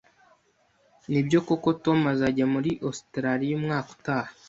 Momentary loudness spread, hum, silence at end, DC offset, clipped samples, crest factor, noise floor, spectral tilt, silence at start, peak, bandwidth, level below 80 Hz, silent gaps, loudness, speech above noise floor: 7 LU; none; 0.15 s; under 0.1%; under 0.1%; 18 dB; -66 dBFS; -7 dB/octave; 1.1 s; -8 dBFS; 8 kHz; -60 dBFS; none; -26 LUFS; 41 dB